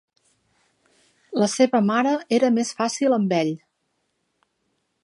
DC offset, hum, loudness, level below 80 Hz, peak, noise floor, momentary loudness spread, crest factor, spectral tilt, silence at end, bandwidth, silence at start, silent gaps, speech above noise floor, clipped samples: under 0.1%; none; -21 LUFS; -76 dBFS; -6 dBFS; -73 dBFS; 7 LU; 18 dB; -5 dB/octave; 1.45 s; 11.5 kHz; 1.3 s; none; 53 dB; under 0.1%